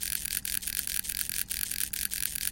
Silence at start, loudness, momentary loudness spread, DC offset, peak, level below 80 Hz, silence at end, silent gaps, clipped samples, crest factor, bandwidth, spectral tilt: 0 s; -30 LUFS; 1 LU; under 0.1%; -10 dBFS; -50 dBFS; 0 s; none; under 0.1%; 24 dB; 17.5 kHz; 1 dB/octave